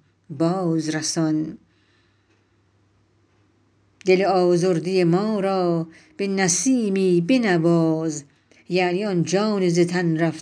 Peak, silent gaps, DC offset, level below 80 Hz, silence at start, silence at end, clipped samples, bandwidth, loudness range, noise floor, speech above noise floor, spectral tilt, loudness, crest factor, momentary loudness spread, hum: -4 dBFS; none; under 0.1%; -70 dBFS; 0.3 s; 0 s; under 0.1%; 10.5 kHz; 7 LU; -62 dBFS; 42 dB; -5.5 dB/octave; -21 LUFS; 18 dB; 8 LU; none